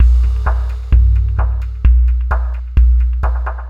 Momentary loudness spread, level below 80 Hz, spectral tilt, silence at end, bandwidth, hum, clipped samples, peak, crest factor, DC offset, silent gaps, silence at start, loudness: 6 LU; -12 dBFS; -8.5 dB/octave; 0 s; 3 kHz; none; under 0.1%; 0 dBFS; 12 dB; under 0.1%; none; 0 s; -16 LUFS